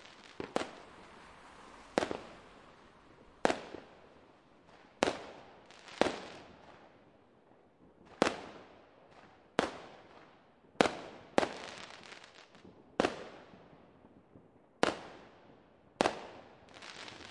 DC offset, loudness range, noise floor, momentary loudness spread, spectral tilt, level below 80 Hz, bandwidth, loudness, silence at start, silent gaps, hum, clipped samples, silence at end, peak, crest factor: under 0.1%; 5 LU; -64 dBFS; 25 LU; -4 dB/octave; -68 dBFS; 11.5 kHz; -37 LUFS; 0 s; none; none; under 0.1%; 0 s; -4 dBFS; 36 dB